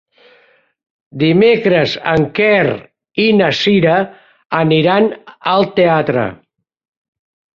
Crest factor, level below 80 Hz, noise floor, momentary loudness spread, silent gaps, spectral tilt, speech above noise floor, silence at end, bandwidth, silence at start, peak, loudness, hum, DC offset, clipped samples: 14 dB; -50 dBFS; -53 dBFS; 11 LU; 4.46-4.50 s; -7 dB/octave; 40 dB; 1.2 s; 7.4 kHz; 1.15 s; 0 dBFS; -13 LUFS; none; under 0.1%; under 0.1%